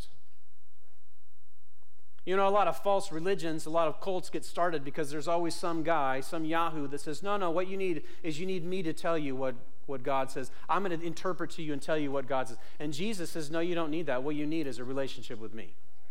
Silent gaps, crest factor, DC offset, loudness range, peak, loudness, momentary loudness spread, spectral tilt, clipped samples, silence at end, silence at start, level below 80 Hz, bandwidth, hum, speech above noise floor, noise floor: none; 16 dB; 4%; 3 LU; -14 dBFS; -33 LUFS; 9 LU; -5 dB/octave; under 0.1%; 0.4 s; 0 s; -66 dBFS; 16.5 kHz; none; 38 dB; -71 dBFS